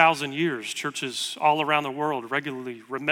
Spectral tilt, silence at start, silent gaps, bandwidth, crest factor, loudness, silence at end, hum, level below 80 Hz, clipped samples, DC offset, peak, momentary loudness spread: -3.5 dB/octave; 0 s; none; 17 kHz; 22 dB; -26 LUFS; 0 s; none; -74 dBFS; under 0.1%; under 0.1%; -4 dBFS; 9 LU